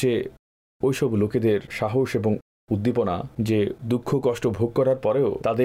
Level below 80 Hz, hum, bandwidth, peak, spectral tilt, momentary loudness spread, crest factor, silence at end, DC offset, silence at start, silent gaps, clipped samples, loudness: -54 dBFS; none; 15.5 kHz; -12 dBFS; -7.5 dB/octave; 5 LU; 12 dB; 0 s; under 0.1%; 0 s; 0.39-0.80 s, 2.42-2.67 s; under 0.1%; -24 LUFS